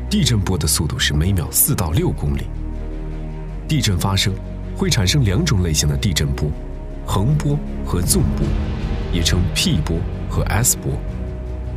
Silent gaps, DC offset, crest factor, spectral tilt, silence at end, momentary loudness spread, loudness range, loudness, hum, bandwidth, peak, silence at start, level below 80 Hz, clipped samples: none; under 0.1%; 16 dB; -4 dB/octave; 0 s; 13 LU; 2 LU; -19 LUFS; none; 16 kHz; -2 dBFS; 0 s; -26 dBFS; under 0.1%